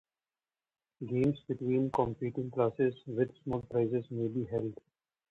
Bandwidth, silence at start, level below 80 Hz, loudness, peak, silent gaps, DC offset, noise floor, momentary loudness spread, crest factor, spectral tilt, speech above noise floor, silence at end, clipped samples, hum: 7.2 kHz; 1 s; -64 dBFS; -33 LUFS; -16 dBFS; none; under 0.1%; under -90 dBFS; 7 LU; 18 dB; -10 dB/octave; over 57 dB; 0.55 s; under 0.1%; none